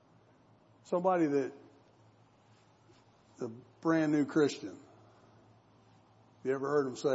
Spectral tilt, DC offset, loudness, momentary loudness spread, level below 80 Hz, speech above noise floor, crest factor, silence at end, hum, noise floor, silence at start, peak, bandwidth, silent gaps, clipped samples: -6.5 dB/octave; under 0.1%; -33 LUFS; 15 LU; -84 dBFS; 33 dB; 18 dB; 0 s; none; -64 dBFS; 0.9 s; -16 dBFS; 8 kHz; none; under 0.1%